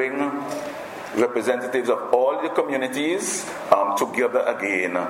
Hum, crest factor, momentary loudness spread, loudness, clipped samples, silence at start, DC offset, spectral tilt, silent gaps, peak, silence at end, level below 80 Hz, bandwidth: none; 22 dB; 9 LU; -23 LUFS; under 0.1%; 0 s; under 0.1%; -3.5 dB/octave; none; 0 dBFS; 0 s; -70 dBFS; 16.5 kHz